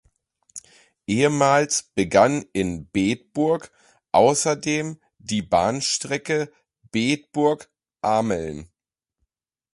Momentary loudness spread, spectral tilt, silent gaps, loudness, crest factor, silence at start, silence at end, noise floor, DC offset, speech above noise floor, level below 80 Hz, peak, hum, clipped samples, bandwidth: 16 LU; -4 dB/octave; none; -22 LUFS; 20 dB; 0.55 s; 1.1 s; -86 dBFS; under 0.1%; 65 dB; -52 dBFS; -4 dBFS; none; under 0.1%; 11.5 kHz